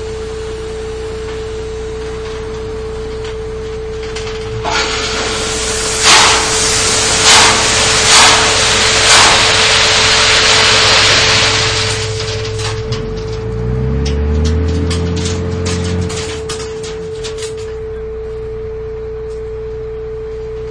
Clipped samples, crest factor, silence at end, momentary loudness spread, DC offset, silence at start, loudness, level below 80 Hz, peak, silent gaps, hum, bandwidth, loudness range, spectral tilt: 0.3%; 14 dB; 0 s; 18 LU; under 0.1%; 0 s; -9 LUFS; -26 dBFS; 0 dBFS; none; none; 11 kHz; 16 LU; -2 dB/octave